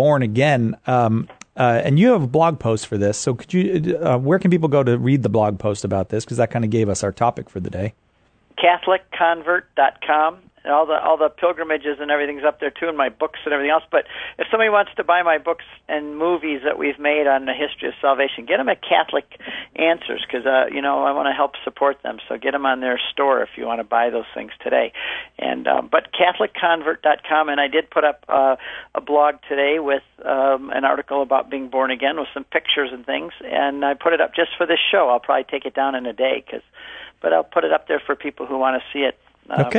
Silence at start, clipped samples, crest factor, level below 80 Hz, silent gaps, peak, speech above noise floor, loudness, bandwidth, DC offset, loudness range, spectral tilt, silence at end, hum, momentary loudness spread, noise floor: 0 s; under 0.1%; 18 dB; -58 dBFS; none; -2 dBFS; 39 dB; -20 LUFS; 9.4 kHz; under 0.1%; 3 LU; -5.5 dB/octave; 0 s; none; 9 LU; -58 dBFS